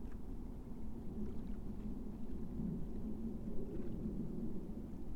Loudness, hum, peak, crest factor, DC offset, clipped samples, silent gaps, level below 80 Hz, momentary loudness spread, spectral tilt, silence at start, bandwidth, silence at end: -47 LUFS; none; -28 dBFS; 14 dB; under 0.1%; under 0.1%; none; -48 dBFS; 6 LU; -9.5 dB/octave; 0 s; 4.5 kHz; 0 s